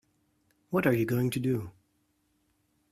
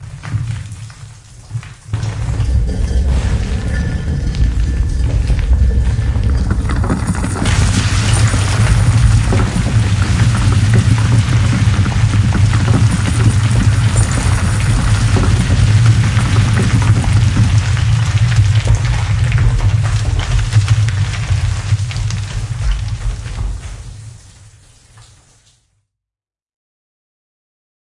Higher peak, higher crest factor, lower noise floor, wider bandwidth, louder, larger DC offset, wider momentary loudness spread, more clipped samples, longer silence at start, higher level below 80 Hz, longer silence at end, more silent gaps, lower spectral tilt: second, -12 dBFS vs 0 dBFS; first, 20 dB vs 14 dB; second, -73 dBFS vs -88 dBFS; first, 16 kHz vs 11.5 kHz; second, -29 LUFS vs -14 LUFS; neither; about the same, 8 LU vs 10 LU; neither; first, 0.7 s vs 0 s; second, -64 dBFS vs -20 dBFS; second, 1.2 s vs 3.85 s; neither; first, -7 dB/octave vs -5.5 dB/octave